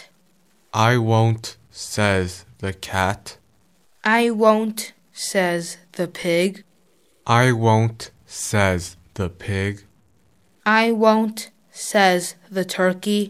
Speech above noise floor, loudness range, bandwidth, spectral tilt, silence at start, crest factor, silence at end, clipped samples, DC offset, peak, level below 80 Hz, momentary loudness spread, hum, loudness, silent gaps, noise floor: 41 dB; 2 LU; 15.5 kHz; -5 dB/octave; 0 s; 18 dB; 0 s; under 0.1%; under 0.1%; -2 dBFS; -54 dBFS; 16 LU; none; -20 LUFS; none; -61 dBFS